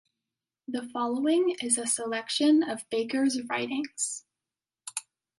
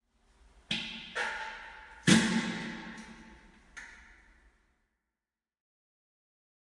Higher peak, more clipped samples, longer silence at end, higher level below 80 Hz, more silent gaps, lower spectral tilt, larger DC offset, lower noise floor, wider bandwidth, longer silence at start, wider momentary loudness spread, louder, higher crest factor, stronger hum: about the same, -12 dBFS vs -10 dBFS; neither; second, 0.4 s vs 2.6 s; second, -80 dBFS vs -62 dBFS; neither; second, -2 dB/octave vs -3.5 dB/octave; neither; about the same, under -90 dBFS vs under -90 dBFS; about the same, 11.5 kHz vs 11.5 kHz; about the same, 0.7 s vs 0.7 s; second, 14 LU vs 25 LU; first, -28 LUFS vs -31 LUFS; second, 18 dB vs 26 dB; neither